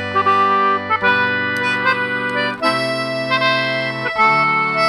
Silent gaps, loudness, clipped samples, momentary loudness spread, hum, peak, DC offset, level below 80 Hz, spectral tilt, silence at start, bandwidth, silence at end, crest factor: none; -16 LUFS; under 0.1%; 5 LU; none; -4 dBFS; under 0.1%; -60 dBFS; -4.5 dB/octave; 0 s; 14.5 kHz; 0 s; 14 dB